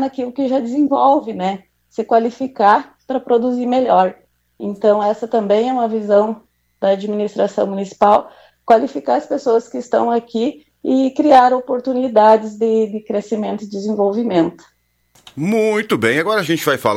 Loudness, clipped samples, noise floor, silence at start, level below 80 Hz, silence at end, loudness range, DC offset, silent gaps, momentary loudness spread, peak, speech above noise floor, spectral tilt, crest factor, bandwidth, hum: -16 LUFS; under 0.1%; -56 dBFS; 0 s; -62 dBFS; 0 s; 3 LU; under 0.1%; none; 10 LU; 0 dBFS; 41 dB; -6 dB/octave; 16 dB; 16.5 kHz; none